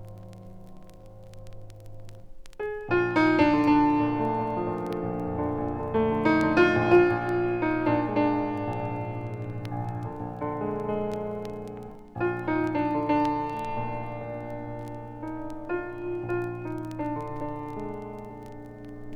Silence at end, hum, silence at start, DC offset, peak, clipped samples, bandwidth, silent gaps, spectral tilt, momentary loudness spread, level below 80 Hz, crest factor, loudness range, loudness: 0 s; none; 0 s; under 0.1%; -8 dBFS; under 0.1%; 8.4 kHz; none; -8 dB/octave; 21 LU; -50 dBFS; 20 dB; 10 LU; -27 LUFS